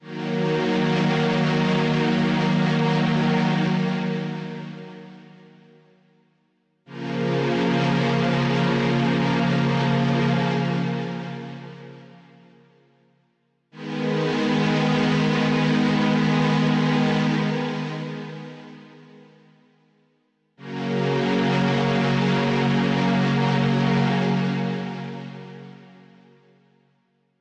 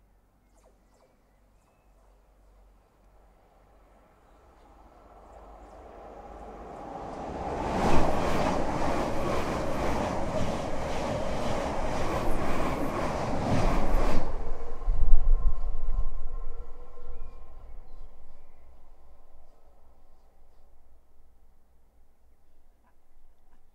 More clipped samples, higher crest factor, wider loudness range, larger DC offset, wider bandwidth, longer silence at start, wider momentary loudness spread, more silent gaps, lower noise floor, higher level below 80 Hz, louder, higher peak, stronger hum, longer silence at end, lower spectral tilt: neither; second, 12 dB vs 24 dB; second, 11 LU vs 20 LU; neither; about the same, 8.6 kHz vs 8.4 kHz; second, 0.05 s vs 5.6 s; second, 16 LU vs 22 LU; neither; first, -68 dBFS vs -63 dBFS; second, -58 dBFS vs -32 dBFS; first, -22 LUFS vs -31 LUFS; second, -12 dBFS vs -2 dBFS; neither; first, 1.55 s vs 0.1 s; about the same, -7 dB/octave vs -6 dB/octave